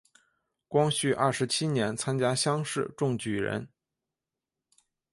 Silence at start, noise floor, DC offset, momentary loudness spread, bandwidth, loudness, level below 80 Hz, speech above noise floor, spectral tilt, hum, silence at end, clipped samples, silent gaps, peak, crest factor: 0.7 s; -89 dBFS; under 0.1%; 5 LU; 11.5 kHz; -28 LUFS; -66 dBFS; 61 dB; -4.5 dB/octave; none; 1.45 s; under 0.1%; none; -10 dBFS; 20 dB